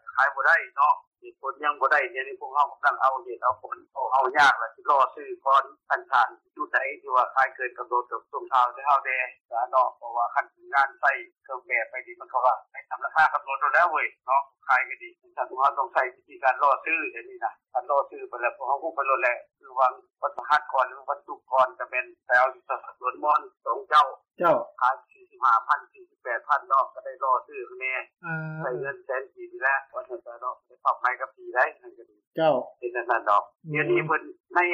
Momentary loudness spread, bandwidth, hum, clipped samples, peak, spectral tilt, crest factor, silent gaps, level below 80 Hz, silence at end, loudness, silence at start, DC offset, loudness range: 12 LU; 11 kHz; none; under 0.1%; -10 dBFS; -5 dB/octave; 16 dB; 1.07-1.11 s, 9.45-9.49 s, 32.27-32.31 s, 34.40-34.44 s; -78 dBFS; 0 s; -25 LUFS; 0.05 s; under 0.1%; 4 LU